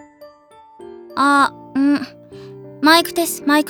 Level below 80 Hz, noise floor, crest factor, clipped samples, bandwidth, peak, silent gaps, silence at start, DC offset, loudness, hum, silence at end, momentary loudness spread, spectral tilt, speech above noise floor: -62 dBFS; -46 dBFS; 18 dB; under 0.1%; over 20 kHz; 0 dBFS; none; 0.2 s; under 0.1%; -16 LUFS; none; 0 s; 24 LU; -2.5 dB/octave; 30 dB